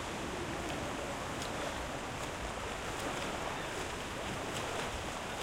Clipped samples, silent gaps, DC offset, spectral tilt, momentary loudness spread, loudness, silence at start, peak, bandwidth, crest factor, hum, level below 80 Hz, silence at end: under 0.1%; none; under 0.1%; -3.5 dB/octave; 2 LU; -39 LUFS; 0 s; -24 dBFS; 16 kHz; 14 dB; none; -52 dBFS; 0 s